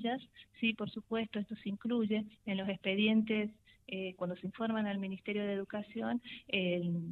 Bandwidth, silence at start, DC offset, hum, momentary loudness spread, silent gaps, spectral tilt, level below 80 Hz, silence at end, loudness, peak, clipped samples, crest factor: 4.4 kHz; 0 s; under 0.1%; none; 10 LU; none; -8 dB/octave; -74 dBFS; 0 s; -36 LUFS; -16 dBFS; under 0.1%; 20 dB